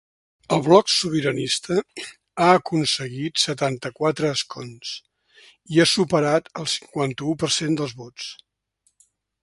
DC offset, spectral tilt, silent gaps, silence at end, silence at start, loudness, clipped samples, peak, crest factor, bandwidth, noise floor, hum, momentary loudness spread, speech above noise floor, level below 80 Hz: under 0.1%; -4 dB/octave; none; 1.1 s; 0.5 s; -21 LUFS; under 0.1%; 0 dBFS; 22 dB; 11.5 kHz; -69 dBFS; none; 17 LU; 47 dB; -60 dBFS